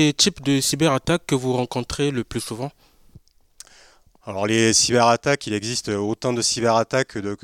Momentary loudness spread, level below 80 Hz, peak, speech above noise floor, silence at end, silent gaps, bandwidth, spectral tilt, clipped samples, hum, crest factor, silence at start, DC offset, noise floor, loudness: 11 LU; -50 dBFS; -4 dBFS; 32 dB; 0.1 s; none; 17 kHz; -3.5 dB/octave; under 0.1%; none; 18 dB; 0 s; under 0.1%; -53 dBFS; -20 LUFS